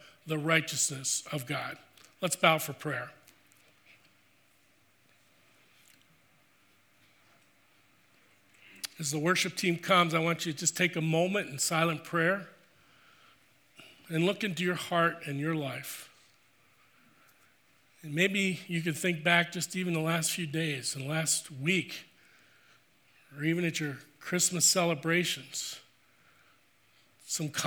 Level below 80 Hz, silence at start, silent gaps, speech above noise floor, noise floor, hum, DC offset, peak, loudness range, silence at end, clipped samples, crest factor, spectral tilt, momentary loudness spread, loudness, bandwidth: -80 dBFS; 0.05 s; none; 37 dB; -67 dBFS; none; under 0.1%; -8 dBFS; 7 LU; 0 s; under 0.1%; 24 dB; -3.5 dB/octave; 13 LU; -30 LUFS; over 20 kHz